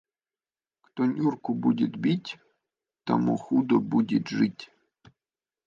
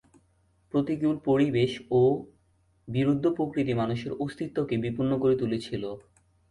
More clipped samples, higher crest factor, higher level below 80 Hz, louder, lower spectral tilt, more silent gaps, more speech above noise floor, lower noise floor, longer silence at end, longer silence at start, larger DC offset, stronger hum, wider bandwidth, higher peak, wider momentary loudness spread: neither; first, 20 dB vs 14 dB; second, -72 dBFS vs -58 dBFS; about the same, -26 LUFS vs -27 LUFS; about the same, -7.5 dB/octave vs -8 dB/octave; neither; first, over 65 dB vs 40 dB; first, under -90 dBFS vs -67 dBFS; first, 1 s vs 0.5 s; first, 0.95 s vs 0.75 s; neither; neither; second, 7.4 kHz vs 11.5 kHz; first, -8 dBFS vs -14 dBFS; first, 16 LU vs 10 LU